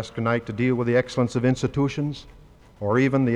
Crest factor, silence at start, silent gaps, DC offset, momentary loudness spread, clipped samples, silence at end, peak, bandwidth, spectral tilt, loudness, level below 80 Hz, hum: 14 dB; 0 s; none; under 0.1%; 9 LU; under 0.1%; 0 s; -8 dBFS; 10.5 kHz; -7 dB/octave; -23 LUFS; -50 dBFS; none